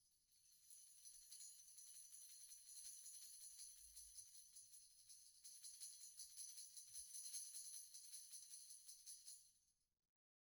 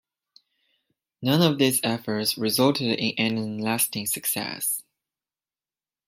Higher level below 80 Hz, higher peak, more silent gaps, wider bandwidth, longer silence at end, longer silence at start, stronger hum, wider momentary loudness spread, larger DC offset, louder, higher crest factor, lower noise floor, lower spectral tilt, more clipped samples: second, under -90 dBFS vs -70 dBFS; second, -40 dBFS vs -4 dBFS; neither; first, over 20 kHz vs 16 kHz; second, 0.75 s vs 1.25 s; second, 0 s vs 1.2 s; neither; first, 9 LU vs 6 LU; neither; second, -58 LUFS vs -24 LUFS; about the same, 22 dB vs 22 dB; second, -83 dBFS vs under -90 dBFS; second, 4 dB/octave vs -4 dB/octave; neither